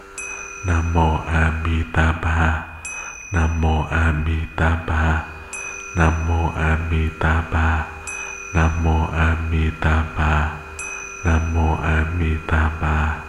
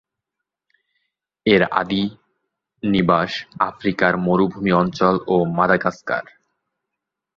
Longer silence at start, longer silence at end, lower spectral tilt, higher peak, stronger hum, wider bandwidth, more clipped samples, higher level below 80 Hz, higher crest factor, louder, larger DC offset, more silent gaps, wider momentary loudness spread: second, 0 s vs 1.45 s; second, 0 s vs 1.15 s; about the same, -6 dB/octave vs -7 dB/octave; about the same, 0 dBFS vs -2 dBFS; neither; first, 11.5 kHz vs 7.2 kHz; neither; first, -24 dBFS vs -52 dBFS; about the same, 18 dB vs 20 dB; about the same, -21 LUFS vs -19 LUFS; neither; neither; about the same, 9 LU vs 9 LU